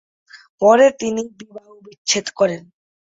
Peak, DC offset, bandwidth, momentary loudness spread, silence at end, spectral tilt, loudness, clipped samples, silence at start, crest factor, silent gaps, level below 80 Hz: -2 dBFS; under 0.1%; 8 kHz; 16 LU; 0.55 s; -3 dB/octave; -17 LUFS; under 0.1%; 0.35 s; 18 dB; 0.49-0.58 s, 1.98-2.05 s; -64 dBFS